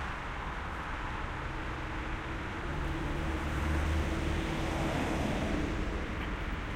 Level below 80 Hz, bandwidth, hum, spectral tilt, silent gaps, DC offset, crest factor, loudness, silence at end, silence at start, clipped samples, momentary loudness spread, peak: -38 dBFS; 15.5 kHz; none; -6 dB/octave; none; under 0.1%; 14 dB; -35 LUFS; 0 s; 0 s; under 0.1%; 6 LU; -20 dBFS